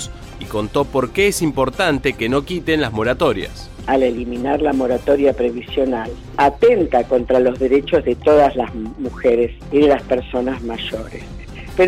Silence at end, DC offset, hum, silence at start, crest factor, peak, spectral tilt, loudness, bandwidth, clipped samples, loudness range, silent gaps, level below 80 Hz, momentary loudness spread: 0 s; under 0.1%; none; 0 s; 14 dB; -4 dBFS; -5.5 dB/octave; -17 LUFS; 16 kHz; under 0.1%; 3 LU; none; -36 dBFS; 12 LU